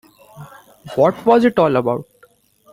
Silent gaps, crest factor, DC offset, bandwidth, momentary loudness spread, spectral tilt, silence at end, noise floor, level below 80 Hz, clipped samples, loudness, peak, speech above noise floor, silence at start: none; 16 dB; under 0.1%; 16 kHz; 12 LU; -7.5 dB/octave; 0.7 s; -54 dBFS; -56 dBFS; under 0.1%; -16 LUFS; -2 dBFS; 39 dB; 0.35 s